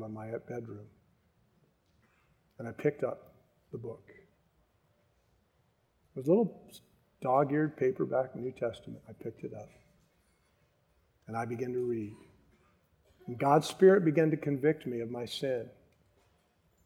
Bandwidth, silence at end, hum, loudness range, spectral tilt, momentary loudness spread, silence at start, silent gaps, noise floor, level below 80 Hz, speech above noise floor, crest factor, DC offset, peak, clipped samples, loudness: 15 kHz; 1.15 s; none; 12 LU; -7 dB/octave; 21 LU; 0 s; none; -73 dBFS; -74 dBFS; 41 dB; 22 dB; under 0.1%; -12 dBFS; under 0.1%; -31 LUFS